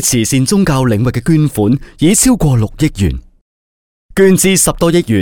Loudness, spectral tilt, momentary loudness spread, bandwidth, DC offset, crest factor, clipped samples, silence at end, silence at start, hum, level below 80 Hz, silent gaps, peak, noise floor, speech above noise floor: -11 LUFS; -5 dB/octave; 7 LU; over 20 kHz; 0.9%; 12 dB; under 0.1%; 0 s; 0 s; none; -28 dBFS; 3.41-4.09 s; 0 dBFS; under -90 dBFS; over 79 dB